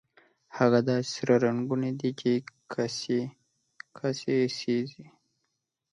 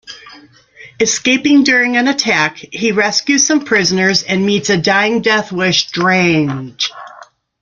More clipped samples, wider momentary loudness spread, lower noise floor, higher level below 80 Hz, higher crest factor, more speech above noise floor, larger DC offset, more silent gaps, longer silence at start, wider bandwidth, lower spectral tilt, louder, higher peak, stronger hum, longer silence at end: neither; first, 13 LU vs 9 LU; first, -81 dBFS vs -42 dBFS; second, -74 dBFS vs -54 dBFS; first, 20 dB vs 14 dB; first, 54 dB vs 28 dB; neither; neither; first, 0.5 s vs 0.05 s; first, 10.5 kHz vs 7.6 kHz; first, -6 dB/octave vs -3 dB/octave; second, -28 LUFS vs -13 LUFS; second, -8 dBFS vs 0 dBFS; neither; first, 0.9 s vs 0.4 s